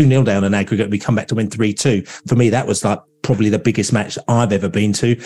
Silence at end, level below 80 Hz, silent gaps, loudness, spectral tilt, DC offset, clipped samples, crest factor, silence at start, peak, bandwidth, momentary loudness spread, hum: 0 s; -50 dBFS; none; -17 LUFS; -6 dB/octave; 0.4%; under 0.1%; 16 dB; 0 s; 0 dBFS; 12 kHz; 5 LU; none